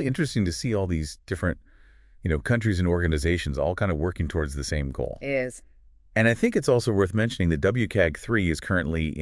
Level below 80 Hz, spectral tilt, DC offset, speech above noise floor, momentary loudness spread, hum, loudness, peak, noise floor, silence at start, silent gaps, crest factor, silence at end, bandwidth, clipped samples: -40 dBFS; -6 dB/octave; under 0.1%; 28 dB; 7 LU; none; -25 LUFS; -6 dBFS; -53 dBFS; 0 s; none; 18 dB; 0 s; 12 kHz; under 0.1%